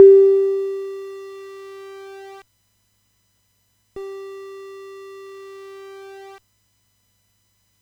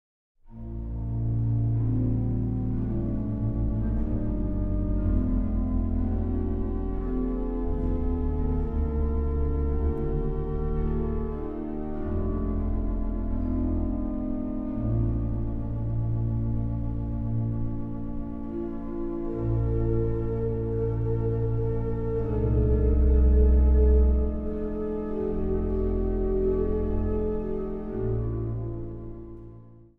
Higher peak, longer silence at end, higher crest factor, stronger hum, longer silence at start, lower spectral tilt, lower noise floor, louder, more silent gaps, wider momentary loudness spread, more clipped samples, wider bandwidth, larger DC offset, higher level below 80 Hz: first, 0 dBFS vs -10 dBFS; first, 3.25 s vs 0.15 s; first, 22 dB vs 16 dB; neither; second, 0 s vs 0.45 s; second, -5.5 dB/octave vs -12.5 dB/octave; first, -66 dBFS vs -48 dBFS; first, -18 LUFS vs -28 LUFS; neither; first, 23 LU vs 9 LU; neither; first, 6 kHz vs 2.7 kHz; neither; second, -70 dBFS vs -28 dBFS